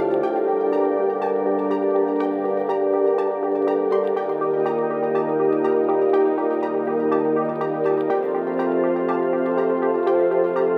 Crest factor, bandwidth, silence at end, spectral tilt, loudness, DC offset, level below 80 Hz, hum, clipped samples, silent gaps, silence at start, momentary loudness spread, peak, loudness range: 12 dB; 4.9 kHz; 0 s; -9 dB/octave; -21 LUFS; under 0.1%; -84 dBFS; none; under 0.1%; none; 0 s; 3 LU; -8 dBFS; 1 LU